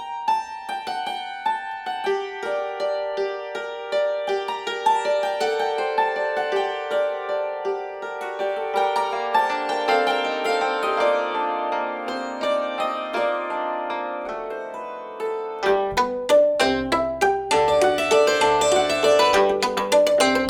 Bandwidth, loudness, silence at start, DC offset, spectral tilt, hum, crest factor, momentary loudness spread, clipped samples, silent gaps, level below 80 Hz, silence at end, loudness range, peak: 17 kHz; -22 LUFS; 0 s; under 0.1%; -2.5 dB/octave; none; 18 dB; 11 LU; under 0.1%; none; -54 dBFS; 0 s; 8 LU; -4 dBFS